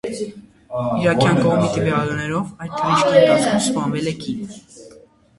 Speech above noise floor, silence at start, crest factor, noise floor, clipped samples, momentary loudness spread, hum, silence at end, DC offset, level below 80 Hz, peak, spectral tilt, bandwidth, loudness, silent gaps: 29 dB; 0.05 s; 18 dB; -48 dBFS; under 0.1%; 15 LU; none; 0.5 s; under 0.1%; -50 dBFS; -2 dBFS; -5.5 dB/octave; 11.5 kHz; -18 LUFS; none